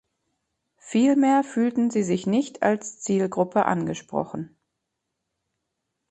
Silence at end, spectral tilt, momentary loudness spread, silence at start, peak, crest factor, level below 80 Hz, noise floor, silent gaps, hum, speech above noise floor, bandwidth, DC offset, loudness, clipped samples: 1.65 s; -6 dB/octave; 10 LU; 0.85 s; -6 dBFS; 20 dB; -66 dBFS; -81 dBFS; none; none; 58 dB; 8.8 kHz; under 0.1%; -23 LUFS; under 0.1%